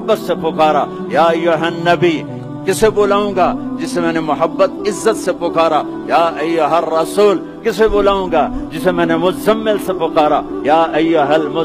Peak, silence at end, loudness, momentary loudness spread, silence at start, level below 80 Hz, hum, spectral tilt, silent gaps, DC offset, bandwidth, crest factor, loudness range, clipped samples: 0 dBFS; 0 s; -14 LUFS; 5 LU; 0 s; -38 dBFS; none; -5 dB/octave; none; under 0.1%; 15 kHz; 14 dB; 1 LU; under 0.1%